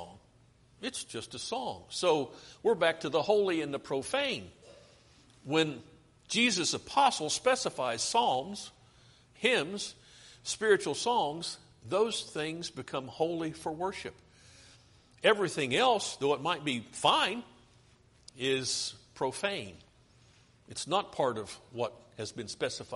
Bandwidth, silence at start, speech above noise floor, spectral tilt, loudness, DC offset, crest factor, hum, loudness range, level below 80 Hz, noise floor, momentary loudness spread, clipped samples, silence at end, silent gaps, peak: 11.5 kHz; 0 s; 32 dB; -3 dB/octave; -31 LUFS; under 0.1%; 22 dB; none; 6 LU; -68 dBFS; -63 dBFS; 14 LU; under 0.1%; 0 s; none; -10 dBFS